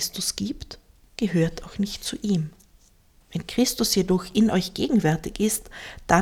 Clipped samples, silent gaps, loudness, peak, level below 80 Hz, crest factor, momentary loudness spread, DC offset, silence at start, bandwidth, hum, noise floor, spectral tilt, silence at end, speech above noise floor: under 0.1%; none; -24 LUFS; -4 dBFS; -46 dBFS; 22 dB; 15 LU; under 0.1%; 0 s; 18 kHz; none; -57 dBFS; -4.5 dB/octave; 0 s; 33 dB